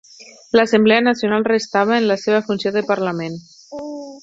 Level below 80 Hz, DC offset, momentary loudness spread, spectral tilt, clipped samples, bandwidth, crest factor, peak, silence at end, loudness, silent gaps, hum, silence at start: -62 dBFS; under 0.1%; 17 LU; -5 dB/octave; under 0.1%; 7.8 kHz; 16 dB; -2 dBFS; 0.05 s; -17 LUFS; none; none; 0.2 s